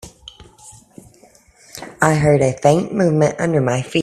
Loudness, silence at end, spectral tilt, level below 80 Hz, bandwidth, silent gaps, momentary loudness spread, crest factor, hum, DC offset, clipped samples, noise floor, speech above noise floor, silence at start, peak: -16 LUFS; 0 s; -6 dB/octave; -48 dBFS; 13.5 kHz; none; 21 LU; 18 dB; none; under 0.1%; under 0.1%; -50 dBFS; 35 dB; 0.05 s; 0 dBFS